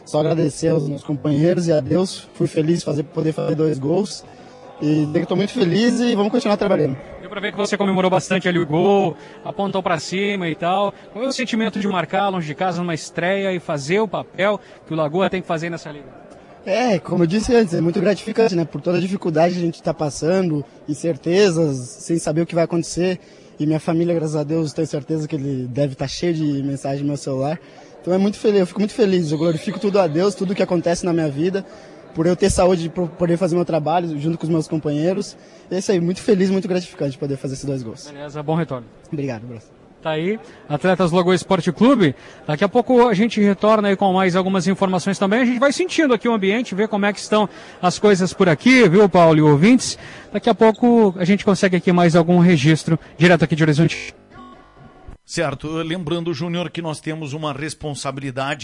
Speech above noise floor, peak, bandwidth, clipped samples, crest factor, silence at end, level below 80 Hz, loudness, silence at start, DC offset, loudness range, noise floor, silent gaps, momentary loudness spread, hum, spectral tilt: 26 dB; -4 dBFS; 11.5 kHz; under 0.1%; 14 dB; 0 s; -48 dBFS; -19 LUFS; 0.05 s; under 0.1%; 7 LU; -45 dBFS; none; 12 LU; none; -6 dB/octave